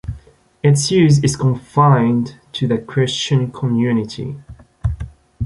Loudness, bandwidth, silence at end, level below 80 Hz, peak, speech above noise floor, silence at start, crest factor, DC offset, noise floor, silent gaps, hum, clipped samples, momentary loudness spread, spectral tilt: -17 LUFS; 11.5 kHz; 0 s; -36 dBFS; -2 dBFS; 29 dB; 0.05 s; 14 dB; under 0.1%; -44 dBFS; none; none; under 0.1%; 17 LU; -6 dB/octave